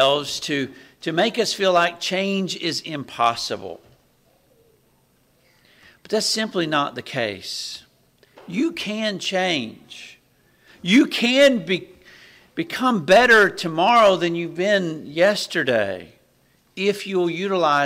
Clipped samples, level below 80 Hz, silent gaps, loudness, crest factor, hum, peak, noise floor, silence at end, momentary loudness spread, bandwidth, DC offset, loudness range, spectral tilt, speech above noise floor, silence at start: under 0.1%; -62 dBFS; none; -20 LUFS; 16 dB; none; -6 dBFS; -61 dBFS; 0 s; 16 LU; 16 kHz; under 0.1%; 10 LU; -4 dB/octave; 41 dB; 0 s